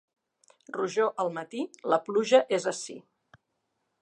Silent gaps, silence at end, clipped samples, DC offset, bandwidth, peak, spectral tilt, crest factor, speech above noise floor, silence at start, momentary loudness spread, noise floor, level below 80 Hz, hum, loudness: none; 1 s; under 0.1%; under 0.1%; 11 kHz; -6 dBFS; -3.5 dB/octave; 22 dB; 52 dB; 0.7 s; 16 LU; -79 dBFS; -84 dBFS; none; -28 LUFS